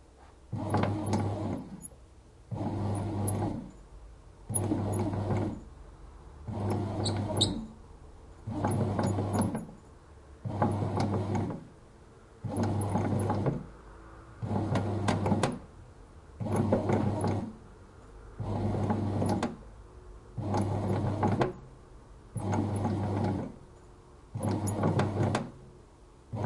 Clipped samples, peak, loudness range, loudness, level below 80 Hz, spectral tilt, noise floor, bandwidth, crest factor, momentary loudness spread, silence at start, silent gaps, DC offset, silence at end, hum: under 0.1%; -12 dBFS; 3 LU; -32 LUFS; -52 dBFS; -6.5 dB/octave; -55 dBFS; 11.5 kHz; 22 dB; 23 LU; 0.2 s; none; under 0.1%; 0 s; none